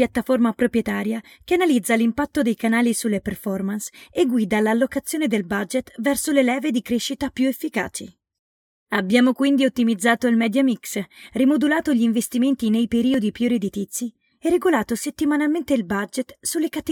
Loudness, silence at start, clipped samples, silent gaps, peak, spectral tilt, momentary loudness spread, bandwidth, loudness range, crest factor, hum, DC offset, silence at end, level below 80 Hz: -21 LUFS; 0 s; under 0.1%; 8.39-8.86 s; -4 dBFS; -4.5 dB/octave; 8 LU; 18 kHz; 3 LU; 16 dB; none; under 0.1%; 0 s; -54 dBFS